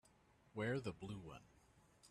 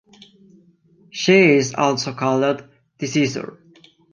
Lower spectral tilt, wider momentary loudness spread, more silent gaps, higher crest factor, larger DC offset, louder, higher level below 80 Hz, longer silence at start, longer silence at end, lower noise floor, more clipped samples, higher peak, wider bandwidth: first, -6.5 dB/octave vs -5 dB/octave; about the same, 15 LU vs 17 LU; neither; about the same, 18 dB vs 18 dB; neither; second, -47 LUFS vs -18 LUFS; second, -72 dBFS vs -64 dBFS; second, 0.55 s vs 1.15 s; second, 0 s vs 0.6 s; first, -72 dBFS vs -54 dBFS; neither; second, -32 dBFS vs -2 dBFS; first, 13 kHz vs 9.4 kHz